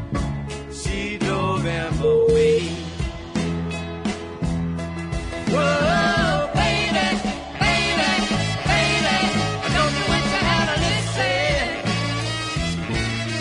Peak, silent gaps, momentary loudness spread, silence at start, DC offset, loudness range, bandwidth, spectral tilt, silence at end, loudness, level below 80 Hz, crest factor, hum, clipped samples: -6 dBFS; none; 10 LU; 0 s; under 0.1%; 3 LU; 11 kHz; -4.5 dB/octave; 0 s; -21 LUFS; -36 dBFS; 16 dB; none; under 0.1%